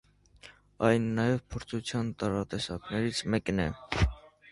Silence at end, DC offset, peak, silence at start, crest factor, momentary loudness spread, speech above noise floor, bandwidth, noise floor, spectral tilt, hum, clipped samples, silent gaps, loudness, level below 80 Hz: 0.25 s; under 0.1%; -10 dBFS; 0.45 s; 22 dB; 8 LU; 26 dB; 11.5 kHz; -56 dBFS; -6 dB/octave; none; under 0.1%; none; -31 LUFS; -42 dBFS